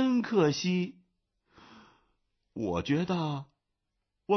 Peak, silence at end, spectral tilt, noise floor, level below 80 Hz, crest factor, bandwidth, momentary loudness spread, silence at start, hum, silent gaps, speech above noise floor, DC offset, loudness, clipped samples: -12 dBFS; 0 s; -6 dB/octave; -83 dBFS; -64 dBFS; 20 dB; 6.4 kHz; 14 LU; 0 s; none; none; 54 dB; under 0.1%; -30 LUFS; under 0.1%